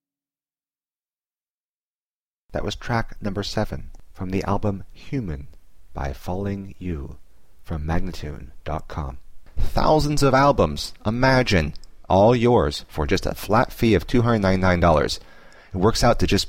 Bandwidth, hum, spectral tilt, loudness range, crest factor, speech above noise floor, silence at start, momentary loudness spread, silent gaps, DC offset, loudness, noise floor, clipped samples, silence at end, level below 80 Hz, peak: 16.5 kHz; none; -6 dB/octave; 12 LU; 16 dB; over 69 dB; 0 s; 16 LU; 0.95-1.00 s, 1.49-2.49 s; 0.8%; -22 LUFS; under -90 dBFS; under 0.1%; 0 s; -32 dBFS; -6 dBFS